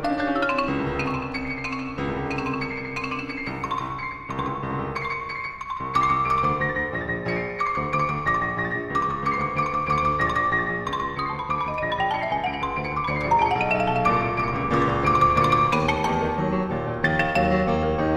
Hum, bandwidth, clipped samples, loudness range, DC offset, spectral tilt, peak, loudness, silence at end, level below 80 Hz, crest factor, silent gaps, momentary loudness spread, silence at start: none; 13 kHz; under 0.1%; 7 LU; under 0.1%; -6.5 dB/octave; -6 dBFS; -24 LUFS; 0 s; -42 dBFS; 18 dB; none; 8 LU; 0 s